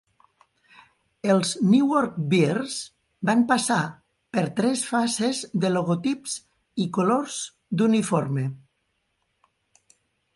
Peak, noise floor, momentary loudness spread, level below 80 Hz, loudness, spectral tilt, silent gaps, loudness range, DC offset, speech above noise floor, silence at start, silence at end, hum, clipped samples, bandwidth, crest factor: -8 dBFS; -74 dBFS; 12 LU; -68 dBFS; -24 LUFS; -5 dB/octave; none; 4 LU; under 0.1%; 51 dB; 1.25 s; 1.8 s; none; under 0.1%; 11.5 kHz; 18 dB